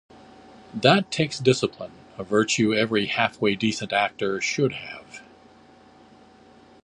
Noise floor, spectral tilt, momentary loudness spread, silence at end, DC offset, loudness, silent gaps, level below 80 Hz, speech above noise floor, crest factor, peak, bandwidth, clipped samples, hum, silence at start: -52 dBFS; -4.5 dB/octave; 19 LU; 1.65 s; under 0.1%; -23 LUFS; none; -62 dBFS; 29 dB; 24 dB; -2 dBFS; 11.5 kHz; under 0.1%; none; 0.75 s